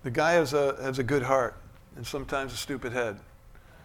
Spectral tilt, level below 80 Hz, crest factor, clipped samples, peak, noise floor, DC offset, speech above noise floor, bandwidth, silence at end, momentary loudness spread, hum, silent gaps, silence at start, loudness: -5 dB/octave; -50 dBFS; 20 dB; under 0.1%; -8 dBFS; -52 dBFS; under 0.1%; 24 dB; 17.5 kHz; 0 s; 13 LU; none; none; 0.05 s; -28 LUFS